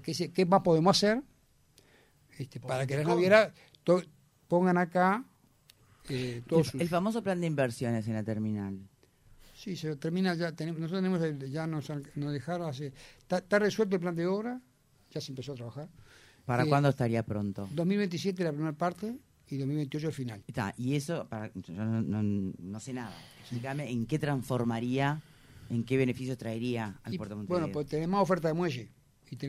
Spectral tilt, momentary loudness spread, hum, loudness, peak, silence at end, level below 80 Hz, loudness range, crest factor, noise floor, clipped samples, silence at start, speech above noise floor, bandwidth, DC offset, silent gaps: -6.5 dB/octave; 14 LU; none; -31 LUFS; -8 dBFS; 0 s; -64 dBFS; 6 LU; 22 dB; -64 dBFS; under 0.1%; 0 s; 34 dB; 15 kHz; under 0.1%; none